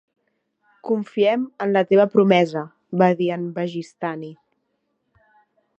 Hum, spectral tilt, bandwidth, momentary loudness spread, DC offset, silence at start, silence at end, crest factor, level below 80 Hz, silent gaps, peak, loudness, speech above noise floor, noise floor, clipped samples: none; -7.5 dB/octave; 8.2 kHz; 14 LU; under 0.1%; 0.85 s; 1.45 s; 20 dB; -72 dBFS; none; -2 dBFS; -20 LUFS; 53 dB; -72 dBFS; under 0.1%